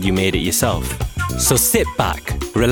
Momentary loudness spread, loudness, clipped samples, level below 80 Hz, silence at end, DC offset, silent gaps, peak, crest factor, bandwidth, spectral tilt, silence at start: 9 LU; -18 LUFS; under 0.1%; -28 dBFS; 0 s; under 0.1%; none; -2 dBFS; 16 dB; 19.5 kHz; -4 dB/octave; 0 s